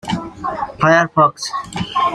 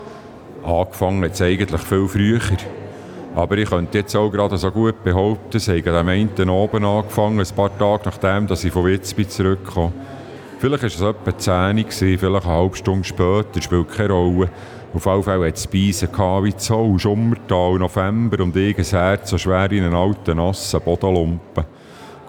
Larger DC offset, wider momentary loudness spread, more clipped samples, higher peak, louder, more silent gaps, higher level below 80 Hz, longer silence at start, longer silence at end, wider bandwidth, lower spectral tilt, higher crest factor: neither; first, 12 LU vs 7 LU; neither; about the same, -2 dBFS vs -2 dBFS; about the same, -17 LUFS vs -19 LUFS; neither; second, -48 dBFS vs -40 dBFS; about the same, 0.05 s vs 0 s; about the same, 0 s vs 0 s; second, 13.5 kHz vs 19.5 kHz; second, -5 dB/octave vs -6.5 dB/octave; about the same, 16 dB vs 16 dB